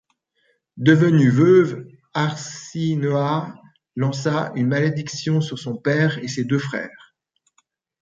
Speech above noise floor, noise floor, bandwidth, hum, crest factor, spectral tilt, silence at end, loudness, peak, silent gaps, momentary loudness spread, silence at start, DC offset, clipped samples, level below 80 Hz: 49 dB; -69 dBFS; 7.8 kHz; none; 20 dB; -6.5 dB/octave; 1.15 s; -20 LUFS; -2 dBFS; none; 15 LU; 0.75 s; under 0.1%; under 0.1%; -62 dBFS